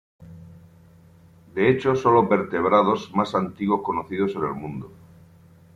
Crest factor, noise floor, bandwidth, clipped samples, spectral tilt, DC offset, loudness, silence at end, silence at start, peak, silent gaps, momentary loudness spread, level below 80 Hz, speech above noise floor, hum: 18 dB; -51 dBFS; 7.8 kHz; under 0.1%; -7.5 dB/octave; under 0.1%; -22 LUFS; 0.85 s; 0.2 s; -6 dBFS; none; 15 LU; -60 dBFS; 30 dB; none